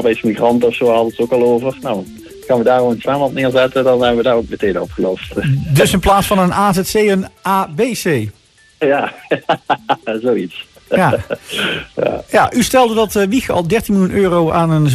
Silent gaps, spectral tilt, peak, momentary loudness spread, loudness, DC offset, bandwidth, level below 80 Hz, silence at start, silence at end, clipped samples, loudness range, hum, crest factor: none; -5.5 dB/octave; -2 dBFS; 7 LU; -15 LUFS; under 0.1%; 14.5 kHz; -38 dBFS; 0 s; 0 s; under 0.1%; 4 LU; none; 12 dB